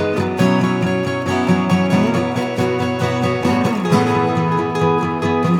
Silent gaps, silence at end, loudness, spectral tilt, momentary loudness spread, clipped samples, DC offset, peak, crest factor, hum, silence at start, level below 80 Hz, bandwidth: none; 0 s; -17 LUFS; -7 dB/octave; 4 LU; under 0.1%; under 0.1%; -2 dBFS; 14 dB; none; 0 s; -54 dBFS; 16 kHz